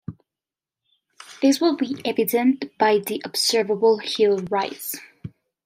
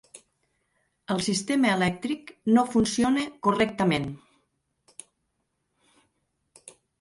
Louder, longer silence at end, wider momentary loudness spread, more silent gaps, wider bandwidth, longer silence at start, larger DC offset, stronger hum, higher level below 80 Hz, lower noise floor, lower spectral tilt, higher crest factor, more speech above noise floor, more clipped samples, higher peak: first, -21 LUFS vs -25 LUFS; second, 0.4 s vs 2.85 s; second, 14 LU vs 24 LU; neither; first, 16 kHz vs 11.5 kHz; about the same, 0.1 s vs 0.15 s; neither; neither; second, -68 dBFS vs -58 dBFS; first, -90 dBFS vs -77 dBFS; second, -3.5 dB/octave vs -5 dB/octave; about the same, 16 dB vs 20 dB; first, 69 dB vs 52 dB; neither; about the same, -6 dBFS vs -8 dBFS